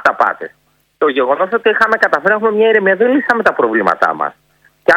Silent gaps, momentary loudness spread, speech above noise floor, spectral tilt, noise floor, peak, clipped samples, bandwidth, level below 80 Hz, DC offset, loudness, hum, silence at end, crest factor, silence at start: none; 7 LU; 45 dB; -5.5 dB/octave; -57 dBFS; 0 dBFS; 0.4%; 10.5 kHz; -58 dBFS; under 0.1%; -13 LUFS; none; 0 s; 14 dB; 0 s